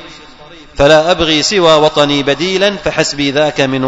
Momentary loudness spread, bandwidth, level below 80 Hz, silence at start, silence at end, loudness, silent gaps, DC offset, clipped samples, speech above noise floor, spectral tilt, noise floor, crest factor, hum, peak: 5 LU; 11 kHz; -34 dBFS; 0 s; 0 s; -10 LUFS; none; under 0.1%; 0.4%; 23 dB; -4 dB/octave; -34 dBFS; 12 dB; none; 0 dBFS